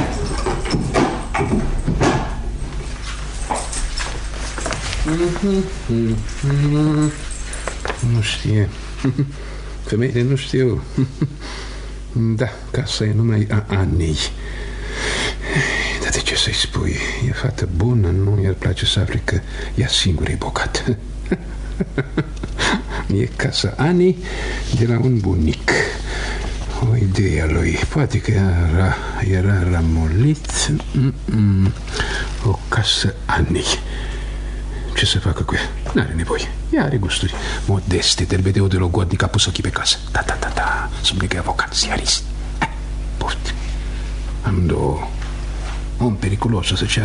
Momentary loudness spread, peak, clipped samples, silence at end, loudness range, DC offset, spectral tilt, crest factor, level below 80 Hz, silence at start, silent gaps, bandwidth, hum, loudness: 11 LU; 0 dBFS; under 0.1%; 0 s; 4 LU; under 0.1%; -5 dB/octave; 18 dB; -26 dBFS; 0 s; none; 11 kHz; none; -19 LUFS